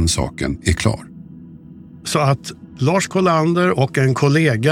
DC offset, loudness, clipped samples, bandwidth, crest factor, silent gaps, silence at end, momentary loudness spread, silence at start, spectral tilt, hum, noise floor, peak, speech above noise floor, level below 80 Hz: under 0.1%; -17 LUFS; under 0.1%; 16 kHz; 16 dB; none; 0 s; 16 LU; 0 s; -5.5 dB/octave; none; -39 dBFS; -2 dBFS; 22 dB; -36 dBFS